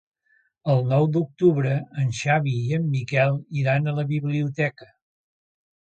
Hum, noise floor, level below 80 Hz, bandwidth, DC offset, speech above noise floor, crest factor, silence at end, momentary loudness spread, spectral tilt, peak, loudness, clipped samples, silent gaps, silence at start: none; -66 dBFS; -62 dBFS; 8.8 kHz; under 0.1%; 43 dB; 18 dB; 1 s; 5 LU; -7.5 dB/octave; -6 dBFS; -23 LUFS; under 0.1%; none; 0.65 s